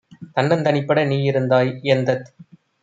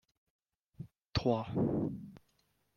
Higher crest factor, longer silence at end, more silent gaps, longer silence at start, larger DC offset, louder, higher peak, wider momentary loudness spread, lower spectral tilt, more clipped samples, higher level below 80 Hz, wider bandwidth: about the same, 16 dB vs 20 dB; about the same, 0.55 s vs 0.6 s; second, none vs 1.06-1.10 s; second, 0.2 s vs 0.8 s; neither; first, -19 LUFS vs -35 LUFS; first, -2 dBFS vs -18 dBFS; second, 5 LU vs 19 LU; about the same, -7.5 dB/octave vs -7.5 dB/octave; neither; second, -64 dBFS vs -58 dBFS; first, 7.8 kHz vs 7 kHz